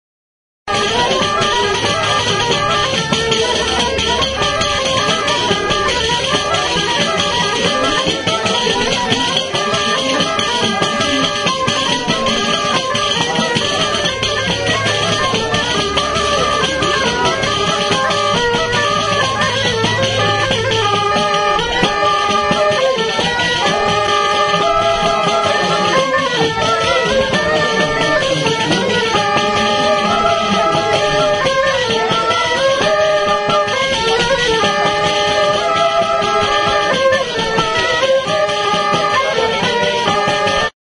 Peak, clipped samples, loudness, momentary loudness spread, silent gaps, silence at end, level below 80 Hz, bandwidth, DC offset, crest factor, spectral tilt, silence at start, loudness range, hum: 0 dBFS; under 0.1%; -14 LUFS; 2 LU; none; 0.15 s; -38 dBFS; 10.5 kHz; under 0.1%; 14 dB; -3 dB/octave; 0.65 s; 1 LU; none